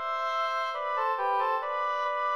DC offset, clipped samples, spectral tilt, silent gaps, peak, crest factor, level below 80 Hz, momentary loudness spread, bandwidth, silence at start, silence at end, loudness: 0.1%; under 0.1%; -0.5 dB/octave; none; -16 dBFS; 12 dB; -82 dBFS; 2 LU; 13.5 kHz; 0 s; 0 s; -29 LUFS